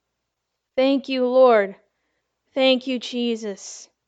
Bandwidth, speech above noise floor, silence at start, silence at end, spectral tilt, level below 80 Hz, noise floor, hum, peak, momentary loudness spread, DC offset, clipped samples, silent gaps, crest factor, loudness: 8 kHz; 60 dB; 0.75 s; 0.25 s; -3.5 dB/octave; -76 dBFS; -79 dBFS; none; -4 dBFS; 16 LU; under 0.1%; under 0.1%; none; 18 dB; -20 LUFS